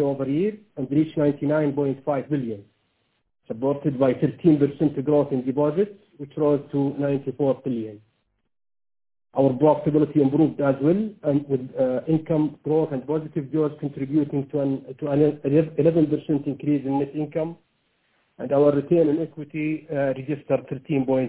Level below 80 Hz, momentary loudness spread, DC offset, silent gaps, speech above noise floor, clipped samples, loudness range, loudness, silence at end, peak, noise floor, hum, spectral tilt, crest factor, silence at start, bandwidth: -60 dBFS; 9 LU; under 0.1%; none; 48 dB; under 0.1%; 3 LU; -23 LUFS; 0 s; -6 dBFS; -70 dBFS; none; -12.5 dB/octave; 18 dB; 0 s; 4 kHz